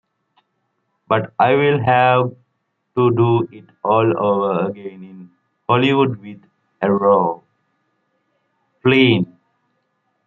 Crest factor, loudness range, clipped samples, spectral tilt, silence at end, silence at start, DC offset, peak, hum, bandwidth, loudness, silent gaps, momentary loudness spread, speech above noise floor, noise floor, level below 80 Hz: 16 dB; 3 LU; under 0.1%; -9 dB/octave; 1.05 s; 1.1 s; under 0.1%; -2 dBFS; none; 5.6 kHz; -17 LUFS; none; 17 LU; 55 dB; -71 dBFS; -62 dBFS